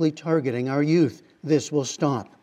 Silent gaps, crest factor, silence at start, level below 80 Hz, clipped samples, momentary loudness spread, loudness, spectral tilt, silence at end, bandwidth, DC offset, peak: none; 16 dB; 0 s; -76 dBFS; under 0.1%; 5 LU; -24 LUFS; -6 dB/octave; 0.15 s; 9.8 kHz; under 0.1%; -8 dBFS